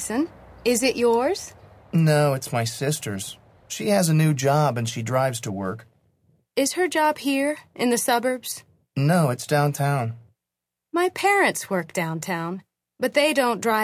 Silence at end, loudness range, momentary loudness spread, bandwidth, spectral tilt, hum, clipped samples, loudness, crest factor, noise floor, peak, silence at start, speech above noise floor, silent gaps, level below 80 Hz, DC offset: 0 s; 2 LU; 12 LU; 16 kHz; -5 dB/octave; none; under 0.1%; -23 LUFS; 16 dB; -85 dBFS; -6 dBFS; 0 s; 63 dB; none; -60 dBFS; under 0.1%